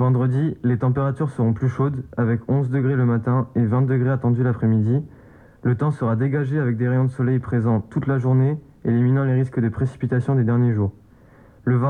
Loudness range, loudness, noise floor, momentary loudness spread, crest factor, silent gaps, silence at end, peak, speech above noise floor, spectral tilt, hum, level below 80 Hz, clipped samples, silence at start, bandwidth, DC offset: 1 LU; -21 LUFS; -49 dBFS; 5 LU; 12 dB; none; 0 s; -8 dBFS; 30 dB; -11 dB/octave; none; -54 dBFS; under 0.1%; 0 s; 3.7 kHz; under 0.1%